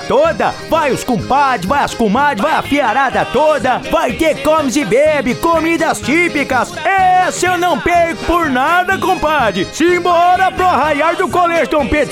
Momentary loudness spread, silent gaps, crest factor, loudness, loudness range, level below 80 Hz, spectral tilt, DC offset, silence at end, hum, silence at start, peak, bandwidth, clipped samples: 3 LU; none; 10 dB; -13 LUFS; 1 LU; -36 dBFS; -4.5 dB/octave; under 0.1%; 0 s; none; 0 s; -2 dBFS; 17 kHz; under 0.1%